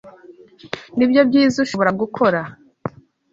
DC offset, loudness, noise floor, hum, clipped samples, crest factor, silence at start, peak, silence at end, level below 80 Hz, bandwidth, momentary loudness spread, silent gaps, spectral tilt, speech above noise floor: under 0.1%; -17 LUFS; -45 dBFS; none; under 0.1%; 18 dB; 0.05 s; -2 dBFS; 0.45 s; -58 dBFS; 7.8 kHz; 18 LU; none; -6 dB/octave; 28 dB